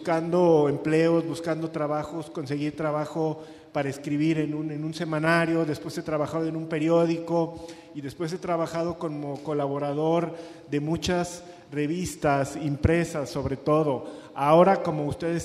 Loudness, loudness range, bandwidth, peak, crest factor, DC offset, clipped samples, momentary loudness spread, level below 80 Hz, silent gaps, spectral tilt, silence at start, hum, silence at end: -26 LUFS; 5 LU; 13 kHz; -6 dBFS; 20 dB; under 0.1%; under 0.1%; 12 LU; -50 dBFS; none; -6.5 dB/octave; 0 s; none; 0 s